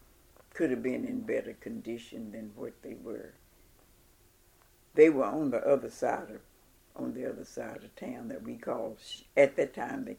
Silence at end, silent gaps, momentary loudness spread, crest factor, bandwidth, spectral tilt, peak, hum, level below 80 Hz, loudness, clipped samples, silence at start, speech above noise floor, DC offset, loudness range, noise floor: 0 s; none; 18 LU; 24 dB; 16.5 kHz; -6 dB/octave; -8 dBFS; none; -66 dBFS; -32 LUFS; under 0.1%; 0.55 s; 32 dB; under 0.1%; 11 LU; -63 dBFS